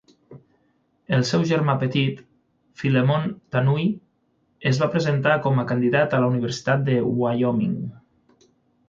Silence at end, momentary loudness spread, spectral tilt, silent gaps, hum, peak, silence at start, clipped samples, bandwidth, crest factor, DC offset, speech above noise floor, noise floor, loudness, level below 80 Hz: 0.9 s; 7 LU; -7 dB/octave; none; none; -6 dBFS; 0.3 s; under 0.1%; 7.6 kHz; 18 dB; under 0.1%; 46 dB; -67 dBFS; -22 LUFS; -60 dBFS